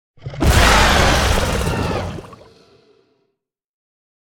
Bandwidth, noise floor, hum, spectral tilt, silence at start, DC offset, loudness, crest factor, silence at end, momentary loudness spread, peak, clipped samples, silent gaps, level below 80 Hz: 17.5 kHz; -74 dBFS; none; -4 dB/octave; 0.25 s; under 0.1%; -15 LUFS; 18 dB; 2 s; 17 LU; 0 dBFS; under 0.1%; none; -24 dBFS